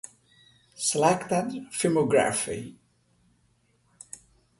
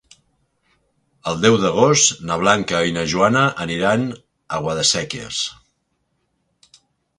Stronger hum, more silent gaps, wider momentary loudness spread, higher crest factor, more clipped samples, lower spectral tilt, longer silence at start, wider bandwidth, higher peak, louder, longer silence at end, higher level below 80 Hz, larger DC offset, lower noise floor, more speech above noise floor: neither; neither; first, 22 LU vs 12 LU; about the same, 22 dB vs 20 dB; neither; about the same, -4 dB/octave vs -3.5 dB/octave; second, 0.8 s vs 1.25 s; about the same, 12 kHz vs 11 kHz; second, -6 dBFS vs 0 dBFS; second, -26 LUFS vs -18 LUFS; first, 1.85 s vs 1.65 s; second, -64 dBFS vs -52 dBFS; neither; about the same, -67 dBFS vs -70 dBFS; second, 42 dB vs 52 dB